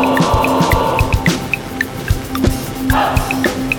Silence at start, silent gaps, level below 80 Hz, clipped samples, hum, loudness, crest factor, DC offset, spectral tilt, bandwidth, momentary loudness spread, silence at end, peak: 0 s; none; -24 dBFS; under 0.1%; none; -16 LUFS; 14 dB; under 0.1%; -5.5 dB/octave; over 20 kHz; 7 LU; 0 s; 0 dBFS